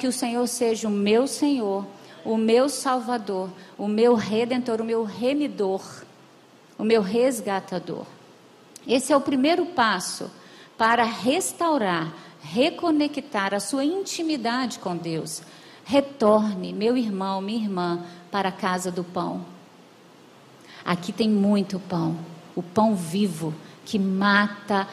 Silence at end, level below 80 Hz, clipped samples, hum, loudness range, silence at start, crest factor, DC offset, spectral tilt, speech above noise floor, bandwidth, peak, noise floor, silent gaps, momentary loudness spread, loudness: 0 s; -70 dBFS; under 0.1%; none; 4 LU; 0 s; 20 dB; under 0.1%; -4.5 dB/octave; 29 dB; 14 kHz; -4 dBFS; -52 dBFS; none; 13 LU; -24 LUFS